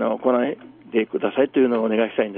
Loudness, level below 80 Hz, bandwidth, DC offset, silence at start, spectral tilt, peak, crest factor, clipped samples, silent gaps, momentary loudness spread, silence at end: -21 LUFS; -70 dBFS; 4 kHz; under 0.1%; 0 s; -4 dB/octave; -6 dBFS; 16 dB; under 0.1%; none; 7 LU; 0 s